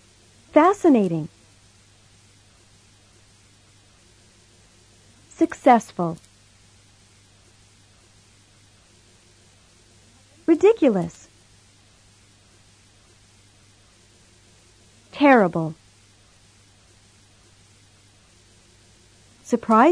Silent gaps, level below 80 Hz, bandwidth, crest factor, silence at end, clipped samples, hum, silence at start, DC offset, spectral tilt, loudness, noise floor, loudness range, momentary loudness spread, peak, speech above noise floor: none; -62 dBFS; 11 kHz; 22 dB; 0 s; under 0.1%; none; 0.55 s; under 0.1%; -6.5 dB/octave; -19 LUFS; -55 dBFS; 10 LU; 19 LU; -4 dBFS; 37 dB